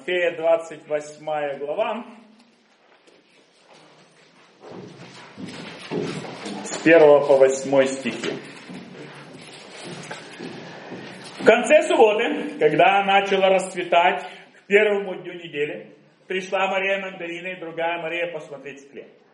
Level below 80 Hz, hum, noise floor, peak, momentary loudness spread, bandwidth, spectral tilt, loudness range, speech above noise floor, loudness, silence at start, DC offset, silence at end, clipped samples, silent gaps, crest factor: -74 dBFS; none; -57 dBFS; 0 dBFS; 23 LU; 11.5 kHz; -4 dB/octave; 16 LU; 37 dB; -20 LUFS; 0.05 s; under 0.1%; 0.3 s; under 0.1%; none; 22 dB